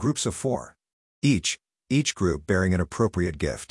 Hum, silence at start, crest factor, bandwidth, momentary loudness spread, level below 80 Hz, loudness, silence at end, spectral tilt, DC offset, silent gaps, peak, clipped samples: none; 0 s; 16 dB; 12 kHz; 6 LU; -48 dBFS; -26 LUFS; 0.05 s; -5 dB/octave; under 0.1%; 0.93-1.22 s; -10 dBFS; under 0.1%